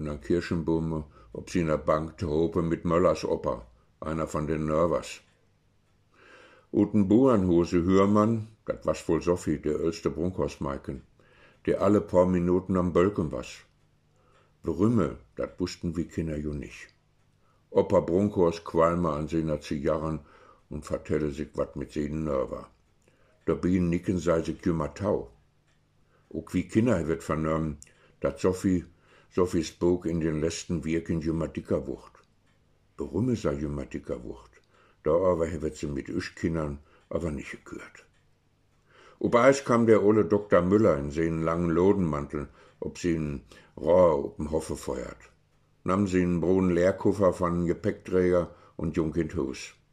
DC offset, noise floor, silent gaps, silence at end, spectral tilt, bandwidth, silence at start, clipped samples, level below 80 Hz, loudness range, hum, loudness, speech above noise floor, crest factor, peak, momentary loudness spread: under 0.1%; -67 dBFS; none; 0.25 s; -7.5 dB/octave; 12.5 kHz; 0 s; under 0.1%; -48 dBFS; 7 LU; none; -27 LUFS; 40 dB; 22 dB; -6 dBFS; 15 LU